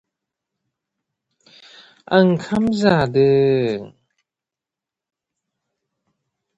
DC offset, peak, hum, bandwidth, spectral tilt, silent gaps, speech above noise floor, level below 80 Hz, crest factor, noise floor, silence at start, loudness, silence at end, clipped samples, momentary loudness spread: under 0.1%; 0 dBFS; none; 8 kHz; -7.5 dB/octave; none; 71 dB; -54 dBFS; 20 dB; -88 dBFS; 2.1 s; -17 LUFS; 2.7 s; under 0.1%; 6 LU